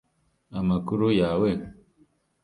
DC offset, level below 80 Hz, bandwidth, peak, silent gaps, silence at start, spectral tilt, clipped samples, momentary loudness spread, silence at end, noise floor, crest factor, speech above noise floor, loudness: under 0.1%; -50 dBFS; 11 kHz; -10 dBFS; none; 0.5 s; -8.5 dB/octave; under 0.1%; 14 LU; 0.7 s; -64 dBFS; 16 dB; 40 dB; -25 LUFS